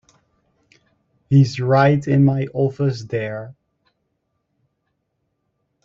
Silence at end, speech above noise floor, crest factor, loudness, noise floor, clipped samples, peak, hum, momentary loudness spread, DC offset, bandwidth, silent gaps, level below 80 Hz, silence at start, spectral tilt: 2.3 s; 56 dB; 20 dB; -18 LUFS; -73 dBFS; under 0.1%; -2 dBFS; none; 12 LU; under 0.1%; 7.4 kHz; none; -56 dBFS; 1.3 s; -8 dB/octave